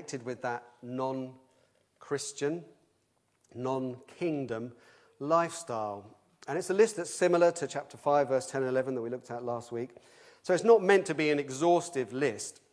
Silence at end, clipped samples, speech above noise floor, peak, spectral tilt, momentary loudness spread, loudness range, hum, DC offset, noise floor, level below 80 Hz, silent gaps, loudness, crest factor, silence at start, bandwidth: 0.2 s; under 0.1%; 44 dB; -10 dBFS; -5 dB/octave; 15 LU; 9 LU; none; under 0.1%; -74 dBFS; -82 dBFS; none; -30 LUFS; 22 dB; 0 s; 11 kHz